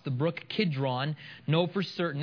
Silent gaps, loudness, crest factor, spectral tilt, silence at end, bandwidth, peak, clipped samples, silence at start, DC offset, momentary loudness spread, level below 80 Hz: none; -30 LUFS; 18 dB; -8 dB/octave; 0 s; 5.4 kHz; -14 dBFS; under 0.1%; 0.05 s; under 0.1%; 5 LU; -76 dBFS